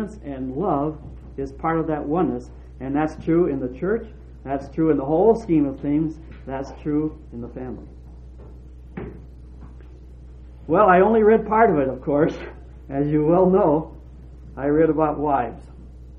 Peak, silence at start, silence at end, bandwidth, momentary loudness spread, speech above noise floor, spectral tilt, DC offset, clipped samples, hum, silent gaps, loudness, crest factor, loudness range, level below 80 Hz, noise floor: -4 dBFS; 0 s; 0 s; 7 kHz; 21 LU; 20 dB; -9.5 dB/octave; under 0.1%; under 0.1%; none; none; -21 LUFS; 18 dB; 13 LU; -40 dBFS; -41 dBFS